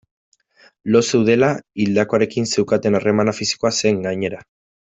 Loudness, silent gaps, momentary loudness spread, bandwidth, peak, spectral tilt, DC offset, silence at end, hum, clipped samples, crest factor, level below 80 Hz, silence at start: -18 LUFS; none; 8 LU; 8.4 kHz; -2 dBFS; -5 dB/octave; under 0.1%; 0.5 s; none; under 0.1%; 16 dB; -56 dBFS; 0.85 s